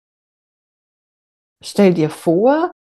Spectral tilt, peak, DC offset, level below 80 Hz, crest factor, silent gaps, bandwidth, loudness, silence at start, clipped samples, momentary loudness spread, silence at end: -7 dB/octave; 0 dBFS; under 0.1%; -66 dBFS; 18 dB; none; 12.5 kHz; -16 LUFS; 1.65 s; under 0.1%; 9 LU; 0.2 s